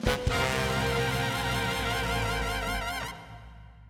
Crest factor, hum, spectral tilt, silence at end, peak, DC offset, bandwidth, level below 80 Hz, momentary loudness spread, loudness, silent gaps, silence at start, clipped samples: 18 dB; none; -4 dB/octave; 0 s; -12 dBFS; under 0.1%; 18 kHz; -38 dBFS; 11 LU; -29 LUFS; none; 0 s; under 0.1%